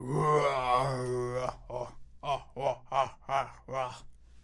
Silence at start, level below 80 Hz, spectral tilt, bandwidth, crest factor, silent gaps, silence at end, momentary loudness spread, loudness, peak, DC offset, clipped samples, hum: 0 s; -54 dBFS; -6 dB/octave; 11.5 kHz; 18 dB; none; 0.05 s; 13 LU; -32 LUFS; -14 dBFS; under 0.1%; under 0.1%; none